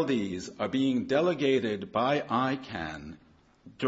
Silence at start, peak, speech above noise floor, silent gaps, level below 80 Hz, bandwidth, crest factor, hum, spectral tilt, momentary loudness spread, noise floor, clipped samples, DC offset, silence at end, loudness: 0 s; -12 dBFS; 27 dB; none; -62 dBFS; 8 kHz; 16 dB; none; -6 dB/octave; 11 LU; -55 dBFS; under 0.1%; under 0.1%; 0 s; -29 LUFS